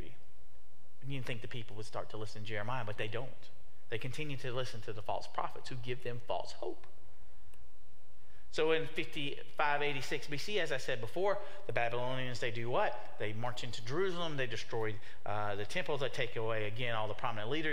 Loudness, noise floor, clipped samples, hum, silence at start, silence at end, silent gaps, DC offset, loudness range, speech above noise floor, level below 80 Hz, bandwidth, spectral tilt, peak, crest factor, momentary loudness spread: -38 LUFS; -66 dBFS; under 0.1%; none; 0 s; 0 s; none; 3%; 7 LU; 27 dB; -64 dBFS; 16 kHz; -5 dB/octave; -14 dBFS; 24 dB; 10 LU